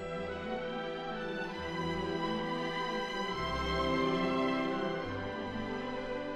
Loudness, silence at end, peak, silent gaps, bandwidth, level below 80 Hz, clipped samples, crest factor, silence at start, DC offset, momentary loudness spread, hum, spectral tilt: -35 LUFS; 0 s; -20 dBFS; none; 13.5 kHz; -52 dBFS; under 0.1%; 14 dB; 0 s; under 0.1%; 7 LU; none; -5.5 dB/octave